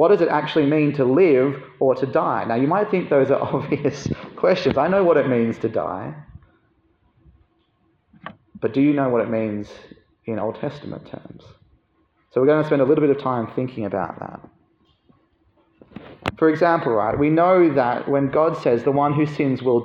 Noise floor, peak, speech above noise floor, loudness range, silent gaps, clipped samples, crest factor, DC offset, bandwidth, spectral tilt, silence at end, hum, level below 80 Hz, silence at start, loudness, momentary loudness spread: -64 dBFS; 0 dBFS; 45 dB; 9 LU; none; under 0.1%; 20 dB; under 0.1%; 7.2 kHz; -8 dB/octave; 0 s; none; -56 dBFS; 0 s; -20 LUFS; 15 LU